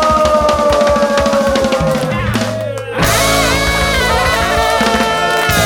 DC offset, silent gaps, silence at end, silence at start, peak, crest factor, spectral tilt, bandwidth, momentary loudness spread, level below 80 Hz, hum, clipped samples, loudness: under 0.1%; none; 0 s; 0 s; 0 dBFS; 12 dB; -4 dB/octave; 19.5 kHz; 5 LU; -26 dBFS; none; under 0.1%; -12 LUFS